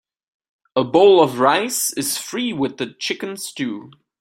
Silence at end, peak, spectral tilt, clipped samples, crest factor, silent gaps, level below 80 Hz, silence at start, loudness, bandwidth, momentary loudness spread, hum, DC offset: 0.35 s; -2 dBFS; -3.5 dB/octave; under 0.1%; 18 dB; none; -64 dBFS; 0.75 s; -18 LUFS; 16.5 kHz; 14 LU; none; under 0.1%